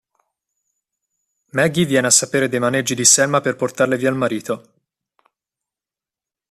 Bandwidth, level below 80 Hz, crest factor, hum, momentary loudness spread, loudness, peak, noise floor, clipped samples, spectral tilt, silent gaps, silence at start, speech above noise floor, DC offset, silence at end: 15 kHz; -60 dBFS; 20 dB; none; 12 LU; -16 LUFS; 0 dBFS; -90 dBFS; under 0.1%; -3 dB/octave; none; 1.55 s; 72 dB; under 0.1%; 1.9 s